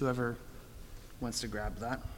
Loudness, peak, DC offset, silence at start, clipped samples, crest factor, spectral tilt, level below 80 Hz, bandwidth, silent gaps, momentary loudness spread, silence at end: -38 LUFS; -20 dBFS; under 0.1%; 0 s; under 0.1%; 18 dB; -5 dB/octave; -48 dBFS; 17 kHz; none; 17 LU; 0 s